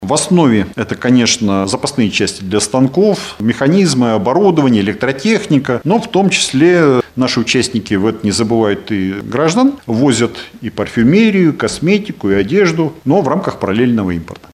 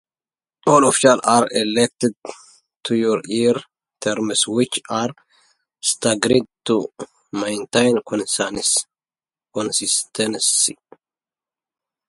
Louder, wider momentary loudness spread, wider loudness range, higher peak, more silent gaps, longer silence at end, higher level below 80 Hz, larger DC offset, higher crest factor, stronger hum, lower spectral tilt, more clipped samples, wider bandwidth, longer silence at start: first, -13 LUFS vs -18 LUFS; second, 7 LU vs 12 LU; about the same, 2 LU vs 4 LU; about the same, 0 dBFS vs 0 dBFS; second, none vs 2.76-2.80 s; second, 0.1 s vs 1.35 s; first, -44 dBFS vs -60 dBFS; neither; second, 12 dB vs 20 dB; neither; first, -5 dB/octave vs -3 dB/octave; neither; first, 13.5 kHz vs 12 kHz; second, 0 s vs 0.65 s